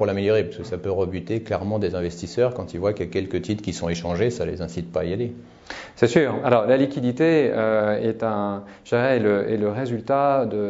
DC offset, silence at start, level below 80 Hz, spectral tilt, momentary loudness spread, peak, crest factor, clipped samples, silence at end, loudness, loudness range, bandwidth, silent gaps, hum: under 0.1%; 0 s; -50 dBFS; -6.5 dB/octave; 9 LU; -2 dBFS; 20 dB; under 0.1%; 0 s; -23 LUFS; 5 LU; 8 kHz; none; none